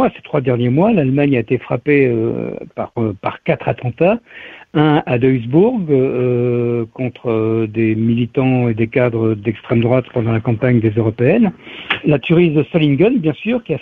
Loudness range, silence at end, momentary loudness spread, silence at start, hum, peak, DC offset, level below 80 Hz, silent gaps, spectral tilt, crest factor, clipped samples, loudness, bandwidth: 3 LU; 0 s; 8 LU; 0 s; none; -2 dBFS; under 0.1%; -48 dBFS; none; -10.5 dB/octave; 14 dB; under 0.1%; -16 LUFS; 4.3 kHz